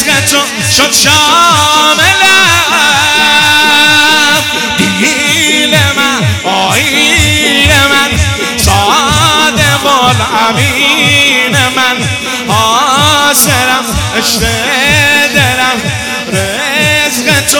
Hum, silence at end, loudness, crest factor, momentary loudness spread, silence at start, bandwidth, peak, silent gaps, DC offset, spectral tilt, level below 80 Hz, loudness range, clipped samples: none; 0 s; -6 LUFS; 8 dB; 6 LU; 0 s; over 20 kHz; 0 dBFS; none; under 0.1%; -2.5 dB/octave; -30 dBFS; 3 LU; 3%